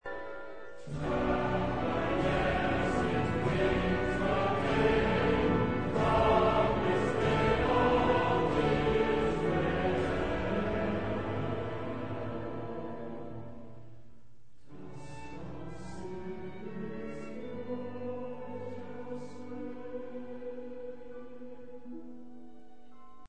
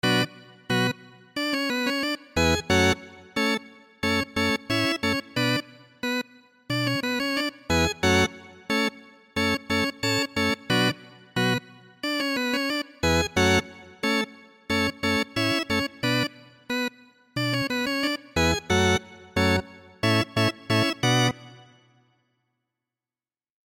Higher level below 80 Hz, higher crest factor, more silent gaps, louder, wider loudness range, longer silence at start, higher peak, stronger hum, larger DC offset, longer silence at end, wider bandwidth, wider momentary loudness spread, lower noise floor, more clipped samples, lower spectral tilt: about the same, -46 dBFS vs -48 dBFS; about the same, 18 dB vs 18 dB; neither; second, -31 LUFS vs -25 LUFS; first, 17 LU vs 2 LU; about the same, 0 s vs 0.05 s; second, -14 dBFS vs -10 dBFS; neither; first, 0.7% vs under 0.1%; second, 0 s vs 2.05 s; second, 9.4 kHz vs 17 kHz; first, 19 LU vs 9 LU; second, -63 dBFS vs under -90 dBFS; neither; first, -7 dB/octave vs -4 dB/octave